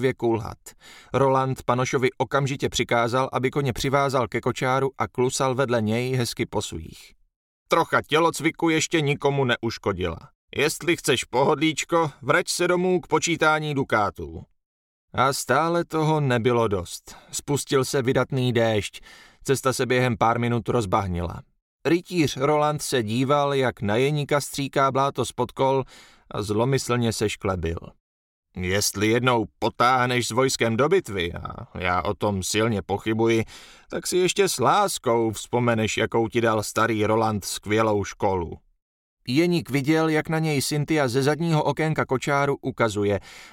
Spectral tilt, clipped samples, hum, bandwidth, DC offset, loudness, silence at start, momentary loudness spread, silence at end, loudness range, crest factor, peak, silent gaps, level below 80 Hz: -5 dB/octave; under 0.1%; none; 17 kHz; under 0.1%; -23 LUFS; 0 s; 8 LU; 0.05 s; 2 LU; 18 dB; -6 dBFS; 7.36-7.66 s, 10.35-10.48 s, 14.66-15.08 s, 21.62-21.79 s, 28.00-28.43 s, 38.82-39.17 s; -50 dBFS